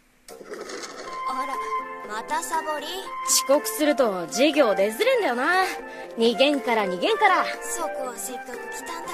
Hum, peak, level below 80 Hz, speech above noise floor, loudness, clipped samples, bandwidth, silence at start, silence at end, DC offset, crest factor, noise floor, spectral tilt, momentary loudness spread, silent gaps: none; -6 dBFS; -62 dBFS; 22 dB; -23 LUFS; under 0.1%; 14 kHz; 0.3 s; 0 s; under 0.1%; 20 dB; -45 dBFS; -2 dB/octave; 15 LU; none